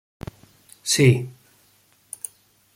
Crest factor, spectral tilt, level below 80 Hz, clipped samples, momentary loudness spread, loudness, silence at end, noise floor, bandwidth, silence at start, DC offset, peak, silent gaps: 22 dB; -4.5 dB/octave; -56 dBFS; under 0.1%; 23 LU; -19 LUFS; 1.45 s; -60 dBFS; 16.5 kHz; 0.85 s; under 0.1%; -4 dBFS; none